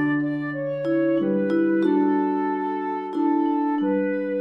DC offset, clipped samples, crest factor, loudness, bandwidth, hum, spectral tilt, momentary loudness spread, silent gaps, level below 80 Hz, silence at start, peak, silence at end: under 0.1%; under 0.1%; 12 dB; -23 LUFS; 5.4 kHz; none; -9.5 dB/octave; 6 LU; none; -76 dBFS; 0 s; -10 dBFS; 0 s